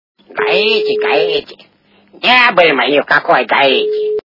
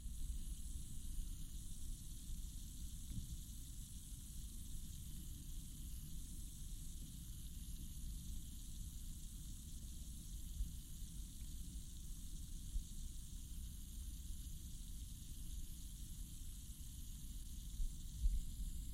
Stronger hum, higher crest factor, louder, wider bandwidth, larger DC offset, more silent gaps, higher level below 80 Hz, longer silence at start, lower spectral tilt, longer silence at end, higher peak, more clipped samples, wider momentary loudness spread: neither; second, 12 dB vs 20 dB; first, -11 LUFS vs -52 LUFS; second, 6 kHz vs 16.5 kHz; neither; neither; second, -60 dBFS vs -48 dBFS; first, 0.3 s vs 0 s; about the same, -4.5 dB/octave vs -4 dB/octave; about the same, 0.05 s vs 0 s; first, 0 dBFS vs -26 dBFS; first, 0.1% vs under 0.1%; first, 8 LU vs 3 LU